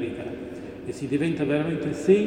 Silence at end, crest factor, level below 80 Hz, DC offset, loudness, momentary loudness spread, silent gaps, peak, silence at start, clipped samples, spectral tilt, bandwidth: 0 s; 18 dB; -56 dBFS; under 0.1%; -27 LUFS; 12 LU; none; -6 dBFS; 0 s; under 0.1%; -7 dB/octave; 10.5 kHz